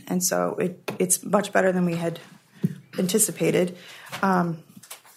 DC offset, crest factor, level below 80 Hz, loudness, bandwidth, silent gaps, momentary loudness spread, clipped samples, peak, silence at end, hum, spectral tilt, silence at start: under 0.1%; 20 dB; -72 dBFS; -24 LUFS; 16 kHz; none; 17 LU; under 0.1%; -6 dBFS; 0.2 s; none; -4.5 dB/octave; 0.05 s